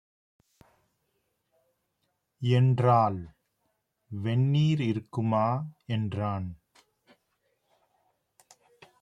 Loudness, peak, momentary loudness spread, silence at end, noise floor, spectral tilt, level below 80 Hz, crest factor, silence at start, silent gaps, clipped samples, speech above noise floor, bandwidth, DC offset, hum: -27 LUFS; -10 dBFS; 14 LU; 2.5 s; -78 dBFS; -8.5 dB/octave; -66 dBFS; 20 dB; 2.4 s; none; under 0.1%; 52 dB; 7.6 kHz; under 0.1%; none